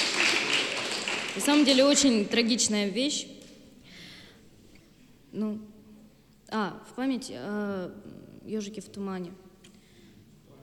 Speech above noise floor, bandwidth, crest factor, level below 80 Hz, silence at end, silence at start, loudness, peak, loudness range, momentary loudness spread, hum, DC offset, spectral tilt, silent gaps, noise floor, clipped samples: 29 dB; 14 kHz; 22 dB; -66 dBFS; 1.25 s; 0 s; -27 LUFS; -8 dBFS; 14 LU; 22 LU; none; under 0.1%; -2.5 dB/octave; none; -57 dBFS; under 0.1%